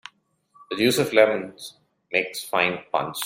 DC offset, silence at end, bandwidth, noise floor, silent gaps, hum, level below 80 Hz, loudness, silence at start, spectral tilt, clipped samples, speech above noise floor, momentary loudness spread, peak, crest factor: under 0.1%; 0 s; 16 kHz; -61 dBFS; none; none; -66 dBFS; -22 LUFS; 0.6 s; -3.5 dB/octave; under 0.1%; 38 dB; 17 LU; -4 dBFS; 22 dB